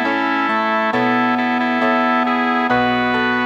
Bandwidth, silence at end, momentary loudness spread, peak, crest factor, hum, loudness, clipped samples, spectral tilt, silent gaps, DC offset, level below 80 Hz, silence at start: 7.6 kHz; 0 s; 2 LU; -4 dBFS; 12 dB; none; -16 LUFS; under 0.1%; -5.5 dB/octave; none; under 0.1%; -52 dBFS; 0 s